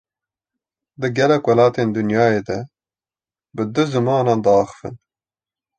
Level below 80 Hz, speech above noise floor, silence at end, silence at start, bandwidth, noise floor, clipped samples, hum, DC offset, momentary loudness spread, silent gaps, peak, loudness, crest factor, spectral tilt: -56 dBFS; over 73 dB; 0.8 s; 1 s; 9 kHz; under -90 dBFS; under 0.1%; none; under 0.1%; 15 LU; none; -2 dBFS; -18 LUFS; 18 dB; -7 dB/octave